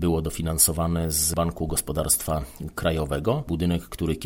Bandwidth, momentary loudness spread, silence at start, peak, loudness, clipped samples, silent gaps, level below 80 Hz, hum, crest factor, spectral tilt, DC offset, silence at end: 17 kHz; 9 LU; 0 s; -4 dBFS; -24 LUFS; under 0.1%; none; -36 dBFS; none; 20 dB; -4.5 dB/octave; under 0.1%; 0 s